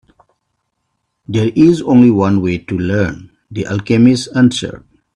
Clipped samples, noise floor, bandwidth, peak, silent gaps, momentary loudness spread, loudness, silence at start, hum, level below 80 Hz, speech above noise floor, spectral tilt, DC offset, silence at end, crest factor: under 0.1%; -70 dBFS; 10.5 kHz; 0 dBFS; none; 14 LU; -13 LUFS; 1.3 s; none; -46 dBFS; 58 dB; -6.5 dB/octave; under 0.1%; 0.4 s; 14 dB